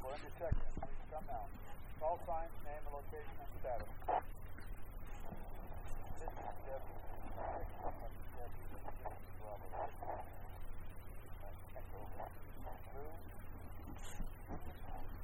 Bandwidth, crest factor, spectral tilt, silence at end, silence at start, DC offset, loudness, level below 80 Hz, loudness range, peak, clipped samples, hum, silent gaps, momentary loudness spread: 16 kHz; 20 dB; -6.5 dB/octave; 0 s; 0 s; under 0.1%; -49 LUFS; -48 dBFS; 7 LU; -24 dBFS; under 0.1%; none; none; 11 LU